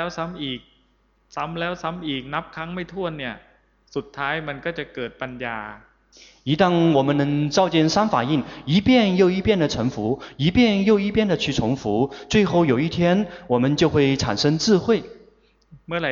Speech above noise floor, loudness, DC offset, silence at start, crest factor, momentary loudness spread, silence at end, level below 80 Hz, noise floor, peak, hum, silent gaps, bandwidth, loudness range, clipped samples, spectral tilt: 41 dB; -21 LUFS; under 0.1%; 0 s; 16 dB; 13 LU; 0 s; -48 dBFS; -62 dBFS; -6 dBFS; none; none; 7.6 kHz; 10 LU; under 0.1%; -6 dB/octave